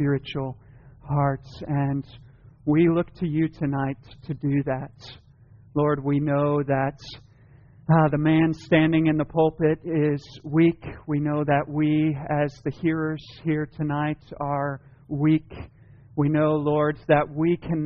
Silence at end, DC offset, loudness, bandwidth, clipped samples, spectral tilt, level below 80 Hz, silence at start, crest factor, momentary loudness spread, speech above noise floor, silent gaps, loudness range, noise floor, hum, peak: 0 s; under 0.1%; -24 LUFS; 6.8 kHz; under 0.1%; -7 dB/octave; -52 dBFS; 0 s; 18 dB; 14 LU; 28 dB; none; 5 LU; -52 dBFS; none; -6 dBFS